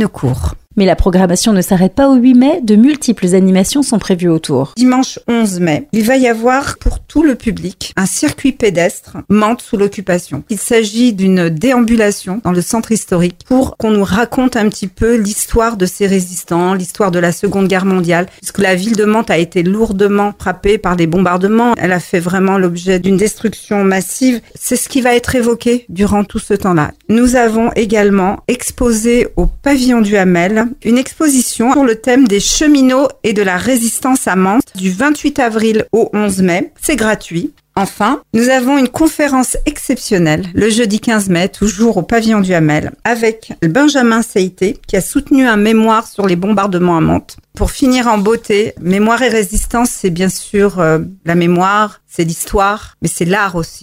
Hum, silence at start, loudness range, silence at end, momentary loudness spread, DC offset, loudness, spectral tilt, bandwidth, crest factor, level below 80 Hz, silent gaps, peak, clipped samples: none; 0 s; 3 LU; 0.05 s; 6 LU; under 0.1%; -12 LUFS; -5 dB/octave; 16 kHz; 12 dB; -30 dBFS; none; 0 dBFS; under 0.1%